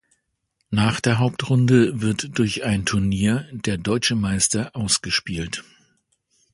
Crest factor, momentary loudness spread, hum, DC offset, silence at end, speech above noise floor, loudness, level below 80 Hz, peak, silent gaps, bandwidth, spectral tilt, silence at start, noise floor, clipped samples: 18 dB; 9 LU; none; under 0.1%; 0.95 s; 53 dB; -21 LUFS; -44 dBFS; -4 dBFS; none; 11.5 kHz; -4.5 dB/octave; 0.7 s; -73 dBFS; under 0.1%